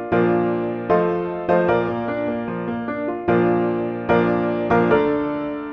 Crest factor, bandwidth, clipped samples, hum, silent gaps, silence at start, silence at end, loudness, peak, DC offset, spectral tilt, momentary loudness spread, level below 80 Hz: 16 dB; 5.8 kHz; under 0.1%; none; none; 0 s; 0 s; -20 LUFS; -4 dBFS; under 0.1%; -9.5 dB/octave; 8 LU; -48 dBFS